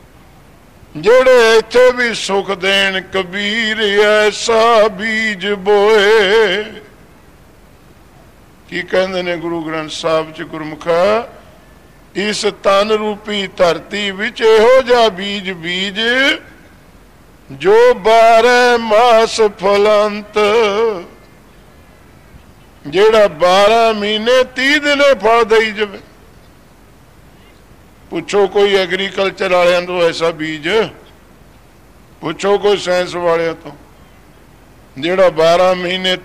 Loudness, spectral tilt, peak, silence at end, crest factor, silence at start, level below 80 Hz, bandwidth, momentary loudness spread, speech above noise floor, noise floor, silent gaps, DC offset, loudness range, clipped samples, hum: -12 LUFS; -3.5 dB/octave; -4 dBFS; 0.05 s; 10 dB; 0.95 s; -46 dBFS; 15 kHz; 11 LU; 31 dB; -44 dBFS; none; 0.4%; 7 LU; under 0.1%; none